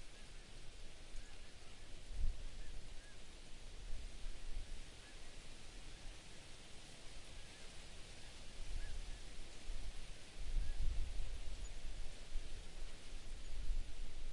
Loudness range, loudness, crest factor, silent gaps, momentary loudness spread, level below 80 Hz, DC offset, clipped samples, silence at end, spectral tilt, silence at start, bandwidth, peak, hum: 5 LU; -54 LUFS; 18 dB; none; 9 LU; -46 dBFS; under 0.1%; under 0.1%; 0 s; -3.5 dB/octave; 0 s; 11.5 kHz; -26 dBFS; none